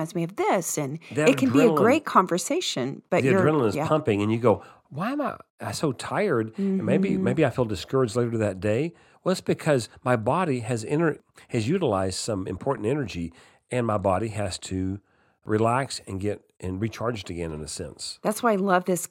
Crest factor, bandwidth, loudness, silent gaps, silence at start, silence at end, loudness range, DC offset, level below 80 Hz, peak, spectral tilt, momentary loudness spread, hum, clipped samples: 20 dB; 16.5 kHz; -25 LUFS; 5.50-5.58 s; 0 s; 0.05 s; 6 LU; under 0.1%; -56 dBFS; -4 dBFS; -5.5 dB/octave; 12 LU; none; under 0.1%